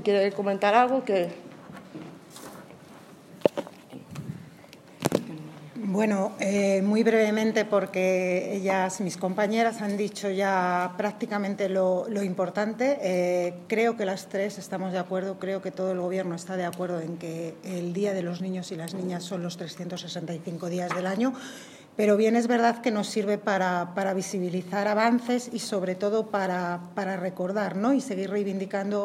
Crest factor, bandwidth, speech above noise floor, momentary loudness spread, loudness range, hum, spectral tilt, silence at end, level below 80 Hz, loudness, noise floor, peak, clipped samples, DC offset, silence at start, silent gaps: 24 dB; 15.5 kHz; 23 dB; 16 LU; 7 LU; none; -5.5 dB/octave; 0 s; -74 dBFS; -27 LUFS; -49 dBFS; -2 dBFS; under 0.1%; under 0.1%; 0 s; none